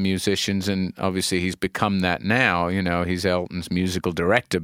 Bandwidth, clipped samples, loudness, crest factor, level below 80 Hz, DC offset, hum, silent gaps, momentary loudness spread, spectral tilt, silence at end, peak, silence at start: 16 kHz; under 0.1%; -23 LUFS; 22 dB; -48 dBFS; under 0.1%; none; none; 6 LU; -5 dB/octave; 0 s; -2 dBFS; 0 s